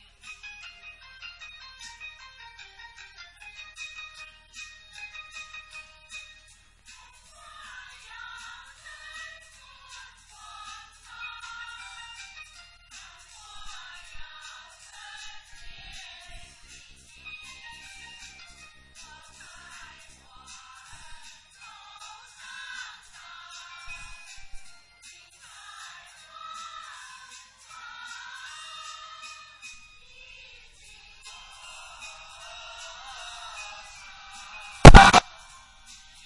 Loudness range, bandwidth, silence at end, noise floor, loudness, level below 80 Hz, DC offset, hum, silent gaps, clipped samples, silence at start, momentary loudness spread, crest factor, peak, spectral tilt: 4 LU; 11.5 kHz; 1.05 s; -55 dBFS; -17 LUFS; -32 dBFS; under 0.1%; none; none; under 0.1%; 34.85 s; 8 LU; 26 dB; 0 dBFS; -5 dB/octave